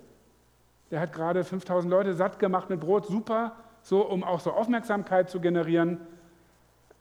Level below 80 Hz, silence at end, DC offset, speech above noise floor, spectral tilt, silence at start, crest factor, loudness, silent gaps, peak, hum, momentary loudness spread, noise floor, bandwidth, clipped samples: -68 dBFS; 0.85 s; under 0.1%; 36 dB; -7.5 dB/octave; 0.9 s; 16 dB; -28 LUFS; none; -12 dBFS; none; 5 LU; -63 dBFS; 18 kHz; under 0.1%